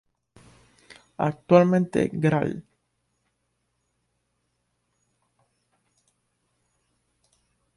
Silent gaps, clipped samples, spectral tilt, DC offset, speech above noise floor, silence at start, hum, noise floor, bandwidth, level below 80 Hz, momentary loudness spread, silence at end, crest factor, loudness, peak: none; under 0.1%; -8 dB/octave; under 0.1%; 54 dB; 1.2 s; none; -75 dBFS; 11 kHz; -62 dBFS; 16 LU; 5.15 s; 24 dB; -22 LUFS; -4 dBFS